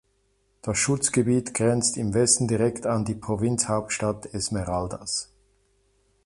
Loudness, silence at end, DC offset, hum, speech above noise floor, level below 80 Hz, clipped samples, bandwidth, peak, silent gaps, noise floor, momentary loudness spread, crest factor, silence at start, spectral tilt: -24 LUFS; 1 s; under 0.1%; none; 44 dB; -50 dBFS; under 0.1%; 11.5 kHz; -6 dBFS; none; -68 dBFS; 9 LU; 20 dB; 0.65 s; -4 dB/octave